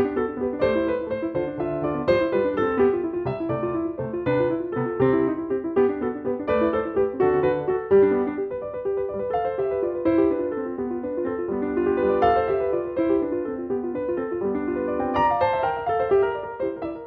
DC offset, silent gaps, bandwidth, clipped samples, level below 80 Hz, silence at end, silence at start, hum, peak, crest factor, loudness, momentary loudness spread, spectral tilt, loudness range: under 0.1%; none; 5 kHz; under 0.1%; -50 dBFS; 0 s; 0 s; none; -6 dBFS; 16 dB; -24 LUFS; 7 LU; -9.5 dB/octave; 2 LU